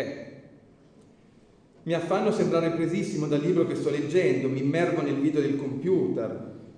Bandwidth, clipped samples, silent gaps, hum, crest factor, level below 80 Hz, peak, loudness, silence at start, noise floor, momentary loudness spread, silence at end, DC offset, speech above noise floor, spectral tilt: 10 kHz; under 0.1%; none; none; 16 dB; -68 dBFS; -10 dBFS; -26 LUFS; 0 s; -56 dBFS; 10 LU; 0.05 s; under 0.1%; 31 dB; -7 dB/octave